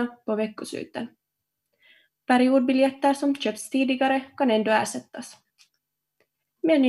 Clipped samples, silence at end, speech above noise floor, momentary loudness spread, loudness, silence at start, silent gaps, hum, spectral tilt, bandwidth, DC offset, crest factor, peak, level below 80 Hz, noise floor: under 0.1%; 0 s; 58 dB; 18 LU; -24 LUFS; 0 s; none; none; -4 dB/octave; 12.5 kHz; under 0.1%; 18 dB; -6 dBFS; -78 dBFS; -82 dBFS